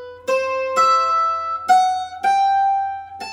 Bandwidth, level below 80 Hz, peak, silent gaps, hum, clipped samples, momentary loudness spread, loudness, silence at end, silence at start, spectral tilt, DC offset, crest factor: 15 kHz; -66 dBFS; -4 dBFS; none; none; under 0.1%; 7 LU; -18 LUFS; 0 s; 0 s; -1.5 dB/octave; under 0.1%; 16 dB